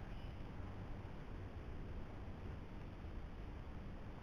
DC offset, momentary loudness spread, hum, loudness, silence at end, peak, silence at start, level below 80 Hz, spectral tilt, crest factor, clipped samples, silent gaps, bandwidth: under 0.1%; 1 LU; none; -52 LUFS; 0 s; -36 dBFS; 0 s; -52 dBFS; -8 dB/octave; 12 dB; under 0.1%; none; 11 kHz